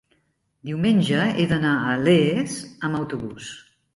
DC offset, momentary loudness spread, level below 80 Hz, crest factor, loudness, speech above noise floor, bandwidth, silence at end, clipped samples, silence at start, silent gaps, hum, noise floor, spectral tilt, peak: under 0.1%; 18 LU; -56 dBFS; 16 dB; -22 LUFS; 47 dB; 11.5 kHz; 0.35 s; under 0.1%; 0.65 s; none; none; -69 dBFS; -6 dB/octave; -6 dBFS